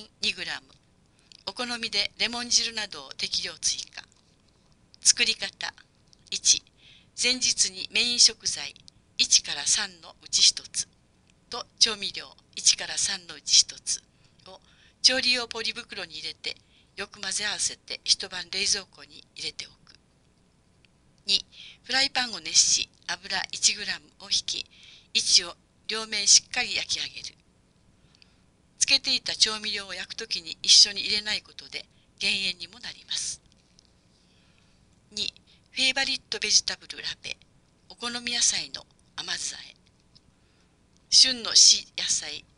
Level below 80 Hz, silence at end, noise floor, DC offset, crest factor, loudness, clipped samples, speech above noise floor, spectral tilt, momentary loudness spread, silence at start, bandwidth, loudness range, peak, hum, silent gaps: -62 dBFS; 0.2 s; -63 dBFS; under 0.1%; 24 dB; -23 LUFS; under 0.1%; 36 dB; 1.5 dB/octave; 19 LU; 0 s; 11.5 kHz; 8 LU; -4 dBFS; none; none